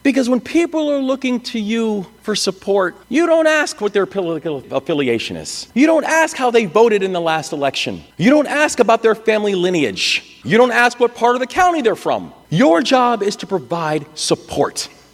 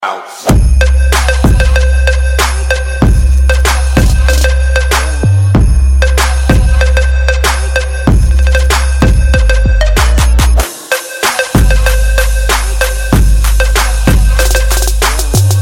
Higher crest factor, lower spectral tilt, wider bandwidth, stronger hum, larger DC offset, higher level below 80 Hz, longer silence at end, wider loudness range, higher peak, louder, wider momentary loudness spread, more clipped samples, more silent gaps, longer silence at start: first, 16 dB vs 8 dB; about the same, -4 dB/octave vs -4.5 dB/octave; about the same, 15 kHz vs 16.5 kHz; neither; neither; second, -54 dBFS vs -10 dBFS; first, 0.25 s vs 0 s; about the same, 3 LU vs 1 LU; about the same, 0 dBFS vs 0 dBFS; second, -16 LUFS vs -10 LUFS; first, 9 LU vs 3 LU; neither; neither; about the same, 0.05 s vs 0 s